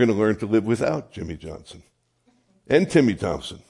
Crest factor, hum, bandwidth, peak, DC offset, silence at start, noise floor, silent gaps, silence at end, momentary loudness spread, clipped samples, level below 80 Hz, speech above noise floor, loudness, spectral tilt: 18 dB; none; 11.5 kHz; -4 dBFS; under 0.1%; 0 s; -65 dBFS; none; 0.1 s; 17 LU; under 0.1%; -52 dBFS; 43 dB; -22 LUFS; -6.5 dB/octave